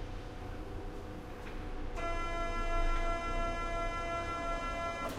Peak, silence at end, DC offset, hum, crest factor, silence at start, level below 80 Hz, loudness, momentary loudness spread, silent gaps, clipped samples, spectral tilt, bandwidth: -22 dBFS; 0 s; under 0.1%; none; 14 dB; 0 s; -38 dBFS; -39 LUFS; 10 LU; none; under 0.1%; -5 dB/octave; 12 kHz